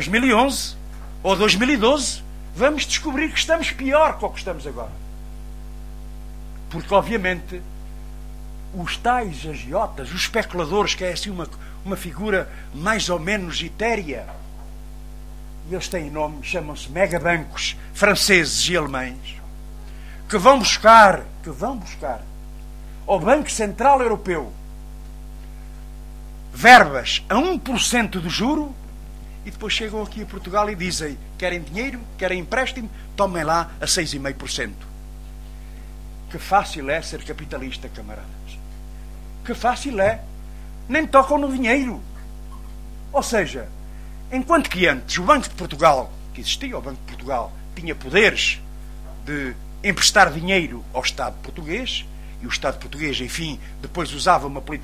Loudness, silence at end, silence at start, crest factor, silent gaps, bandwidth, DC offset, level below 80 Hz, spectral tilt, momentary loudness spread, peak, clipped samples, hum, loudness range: -20 LUFS; 0 s; 0 s; 22 dB; none; 16 kHz; 0.5%; -36 dBFS; -3.5 dB/octave; 23 LU; 0 dBFS; under 0.1%; none; 10 LU